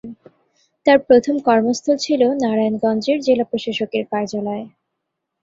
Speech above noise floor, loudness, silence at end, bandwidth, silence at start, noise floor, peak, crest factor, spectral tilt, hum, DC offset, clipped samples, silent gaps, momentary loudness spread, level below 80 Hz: 61 dB; -18 LUFS; 0.75 s; 7.8 kHz; 0.05 s; -78 dBFS; -2 dBFS; 16 dB; -5 dB/octave; none; under 0.1%; under 0.1%; none; 9 LU; -60 dBFS